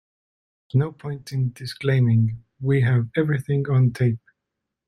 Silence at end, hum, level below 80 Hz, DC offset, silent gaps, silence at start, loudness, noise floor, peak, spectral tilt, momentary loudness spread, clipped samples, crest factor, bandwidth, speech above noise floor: 0.7 s; none; -56 dBFS; under 0.1%; none; 0.75 s; -22 LUFS; -82 dBFS; -6 dBFS; -8.5 dB/octave; 9 LU; under 0.1%; 16 dB; 11 kHz; 61 dB